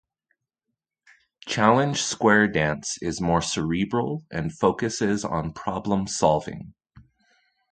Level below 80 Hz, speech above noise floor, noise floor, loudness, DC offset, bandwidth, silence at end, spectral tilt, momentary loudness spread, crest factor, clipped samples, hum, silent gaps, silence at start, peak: -50 dBFS; 60 dB; -83 dBFS; -24 LUFS; under 0.1%; 9.4 kHz; 0.75 s; -4.5 dB/octave; 11 LU; 22 dB; under 0.1%; none; none; 1.45 s; -2 dBFS